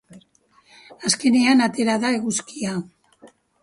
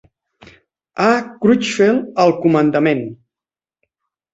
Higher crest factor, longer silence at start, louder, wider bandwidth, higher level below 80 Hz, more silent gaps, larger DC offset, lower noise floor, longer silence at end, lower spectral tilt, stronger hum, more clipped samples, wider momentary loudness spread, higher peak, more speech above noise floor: about the same, 20 dB vs 16 dB; second, 0.15 s vs 0.95 s; second, -20 LUFS vs -15 LUFS; first, 11.5 kHz vs 8.2 kHz; second, -64 dBFS vs -58 dBFS; neither; neither; second, -58 dBFS vs under -90 dBFS; second, 0.35 s vs 1.2 s; second, -3.5 dB/octave vs -6 dB/octave; neither; neither; first, 12 LU vs 7 LU; about the same, -2 dBFS vs -2 dBFS; second, 39 dB vs over 75 dB